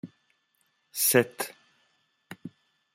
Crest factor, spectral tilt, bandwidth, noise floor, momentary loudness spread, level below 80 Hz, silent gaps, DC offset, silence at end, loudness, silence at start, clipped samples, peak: 26 dB; -3 dB/octave; 16 kHz; -73 dBFS; 26 LU; -76 dBFS; none; under 0.1%; 0.45 s; -26 LUFS; 0.05 s; under 0.1%; -6 dBFS